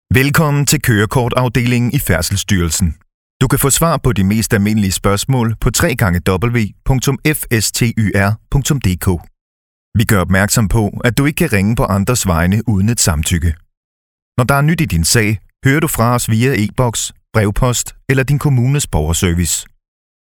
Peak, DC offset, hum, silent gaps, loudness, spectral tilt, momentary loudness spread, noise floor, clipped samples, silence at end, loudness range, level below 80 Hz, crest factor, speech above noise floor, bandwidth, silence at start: 0 dBFS; under 0.1%; none; 3.14-3.40 s, 9.41-9.92 s, 13.77-14.32 s; -14 LUFS; -5 dB/octave; 5 LU; under -90 dBFS; under 0.1%; 0.7 s; 2 LU; -28 dBFS; 14 dB; over 77 dB; over 20 kHz; 0.1 s